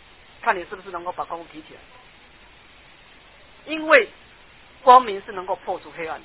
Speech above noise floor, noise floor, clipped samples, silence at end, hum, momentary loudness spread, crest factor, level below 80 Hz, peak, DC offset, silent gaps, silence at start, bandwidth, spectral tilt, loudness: 29 dB; -50 dBFS; under 0.1%; 0.05 s; none; 19 LU; 24 dB; -58 dBFS; 0 dBFS; 0.1%; none; 0.45 s; 4 kHz; -7 dB/octave; -21 LUFS